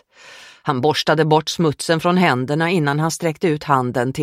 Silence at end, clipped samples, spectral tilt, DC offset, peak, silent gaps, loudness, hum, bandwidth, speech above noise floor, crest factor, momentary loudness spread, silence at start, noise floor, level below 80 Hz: 0 s; under 0.1%; -5.5 dB/octave; under 0.1%; 0 dBFS; none; -18 LUFS; none; 16 kHz; 25 dB; 18 dB; 5 LU; 0.25 s; -43 dBFS; -56 dBFS